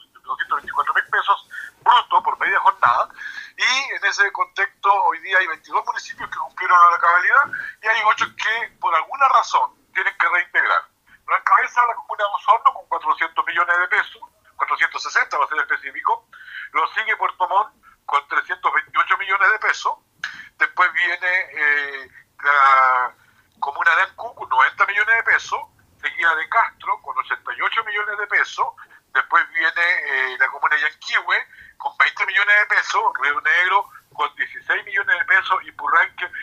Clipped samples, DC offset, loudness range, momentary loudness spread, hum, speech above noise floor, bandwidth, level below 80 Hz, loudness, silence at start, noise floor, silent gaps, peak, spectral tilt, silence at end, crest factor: under 0.1%; under 0.1%; 4 LU; 11 LU; none; 37 dB; 15 kHz; -68 dBFS; -18 LUFS; 0.25 s; -56 dBFS; none; 0 dBFS; 0 dB/octave; 0 s; 20 dB